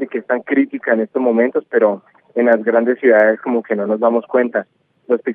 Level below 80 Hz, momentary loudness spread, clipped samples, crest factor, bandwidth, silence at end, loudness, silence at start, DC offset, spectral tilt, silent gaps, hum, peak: -84 dBFS; 8 LU; under 0.1%; 16 dB; 4.3 kHz; 0 s; -16 LUFS; 0 s; under 0.1%; -9.5 dB/octave; none; none; 0 dBFS